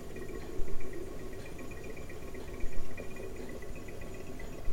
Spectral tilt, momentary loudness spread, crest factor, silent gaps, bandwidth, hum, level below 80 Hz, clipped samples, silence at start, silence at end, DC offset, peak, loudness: -5.5 dB/octave; 2 LU; 14 dB; none; 15 kHz; none; -42 dBFS; under 0.1%; 0 s; 0 s; under 0.1%; -16 dBFS; -45 LUFS